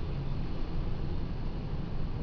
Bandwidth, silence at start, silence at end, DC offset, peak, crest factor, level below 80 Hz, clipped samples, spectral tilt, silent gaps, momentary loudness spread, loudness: 5.4 kHz; 0 s; 0 s; under 0.1%; -20 dBFS; 10 dB; -34 dBFS; under 0.1%; -9 dB/octave; none; 1 LU; -38 LUFS